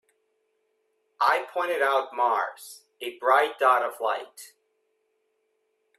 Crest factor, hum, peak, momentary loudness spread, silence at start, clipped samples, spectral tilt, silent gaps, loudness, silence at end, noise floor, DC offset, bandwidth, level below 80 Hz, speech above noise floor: 20 dB; none; -8 dBFS; 16 LU; 1.2 s; under 0.1%; -1 dB/octave; none; -25 LUFS; 1.5 s; -74 dBFS; under 0.1%; 15 kHz; -86 dBFS; 49 dB